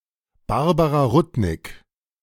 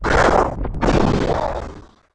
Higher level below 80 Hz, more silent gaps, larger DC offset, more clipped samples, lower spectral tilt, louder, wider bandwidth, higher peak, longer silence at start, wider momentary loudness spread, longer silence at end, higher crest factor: second, -40 dBFS vs -26 dBFS; neither; neither; neither; first, -7.5 dB/octave vs -6 dB/octave; about the same, -20 LUFS vs -18 LUFS; first, 16.5 kHz vs 10 kHz; about the same, -6 dBFS vs -4 dBFS; first, 0.5 s vs 0 s; first, 19 LU vs 13 LU; first, 0.45 s vs 0.3 s; about the same, 16 dB vs 14 dB